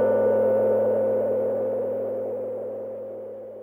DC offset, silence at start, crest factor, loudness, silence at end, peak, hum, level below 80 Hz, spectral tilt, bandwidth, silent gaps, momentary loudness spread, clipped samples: under 0.1%; 0 s; 12 dB; -24 LUFS; 0 s; -12 dBFS; none; -70 dBFS; -9.5 dB/octave; 3 kHz; none; 14 LU; under 0.1%